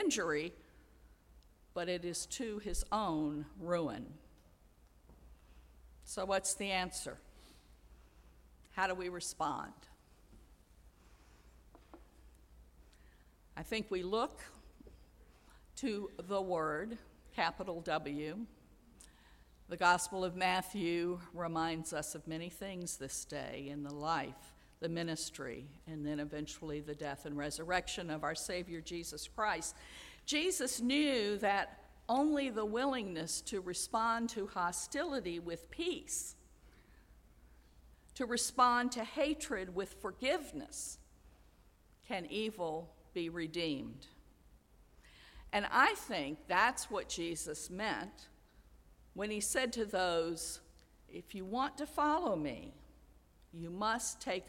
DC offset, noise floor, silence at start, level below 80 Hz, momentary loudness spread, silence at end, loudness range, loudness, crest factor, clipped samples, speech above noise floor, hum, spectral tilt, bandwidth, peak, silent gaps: under 0.1%; -66 dBFS; 0 s; -60 dBFS; 14 LU; 0 s; 8 LU; -38 LUFS; 24 dB; under 0.1%; 28 dB; none; -3 dB/octave; 16.5 kHz; -16 dBFS; none